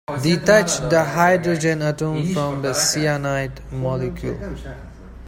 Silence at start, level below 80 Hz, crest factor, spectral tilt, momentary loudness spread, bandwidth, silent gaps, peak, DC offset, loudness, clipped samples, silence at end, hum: 0.1 s; -40 dBFS; 18 dB; -4.5 dB/octave; 14 LU; 16.5 kHz; none; -2 dBFS; under 0.1%; -19 LUFS; under 0.1%; 0 s; none